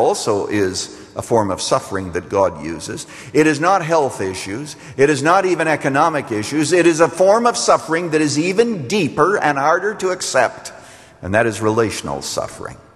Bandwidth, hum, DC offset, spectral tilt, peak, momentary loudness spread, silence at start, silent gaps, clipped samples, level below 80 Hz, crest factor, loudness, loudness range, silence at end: 13 kHz; none; under 0.1%; -4.5 dB/octave; 0 dBFS; 13 LU; 0 s; none; under 0.1%; -52 dBFS; 16 dB; -17 LUFS; 4 LU; 0.2 s